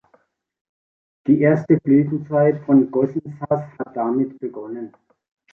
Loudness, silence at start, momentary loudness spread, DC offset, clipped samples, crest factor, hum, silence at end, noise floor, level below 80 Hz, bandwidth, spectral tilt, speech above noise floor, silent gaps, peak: -19 LUFS; 1.25 s; 15 LU; under 0.1%; under 0.1%; 18 dB; none; 0.65 s; -61 dBFS; -62 dBFS; 2.9 kHz; -11.5 dB/octave; 42 dB; none; -2 dBFS